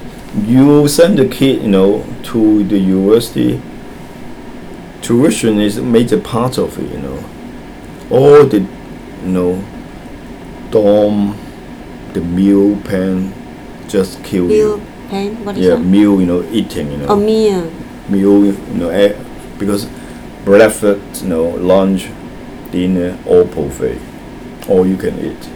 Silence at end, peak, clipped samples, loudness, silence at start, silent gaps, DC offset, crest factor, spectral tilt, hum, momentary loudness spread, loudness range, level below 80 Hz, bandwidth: 0 s; 0 dBFS; 0.3%; -12 LUFS; 0 s; none; under 0.1%; 12 dB; -6.5 dB/octave; none; 21 LU; 4 LU; -38 dBFS; over 20 kHz